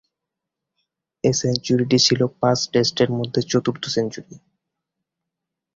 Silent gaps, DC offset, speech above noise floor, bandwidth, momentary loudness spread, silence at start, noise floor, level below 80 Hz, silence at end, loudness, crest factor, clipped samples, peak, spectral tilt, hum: none; under 0.1%; 64 dB; 7.8 kHz; 8 LU; 1.25 s; -84 dBFS; -56 dBFS; 1.4 s; -20 LUFS; 20 dB; under 0.1%; -2 dBFS; -4.5 dB/octave; none